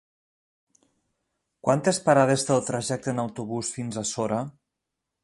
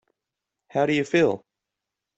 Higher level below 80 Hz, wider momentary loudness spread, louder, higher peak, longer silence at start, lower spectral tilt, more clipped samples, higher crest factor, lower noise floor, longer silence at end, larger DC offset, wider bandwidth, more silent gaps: about the same, -64 dBFS vs -64 dBFS; about the same, 10 LU vs 10 LU; about the same, -25 LUFS vs -23 LUFS; about the same, -6 dBFS vs -8 dBFS; first, 1.65 s vs 0.75 s; about the same, -5 dB/octave vs -6 dB/octave; neither; about the same, 22 dB vs 18 dB; about the same, -84 dBFS vs -85 dBFS; about the same, 0.75 s vs 0.8 s; neither; first, 11.5 kHz vs 8.2 kHz; neither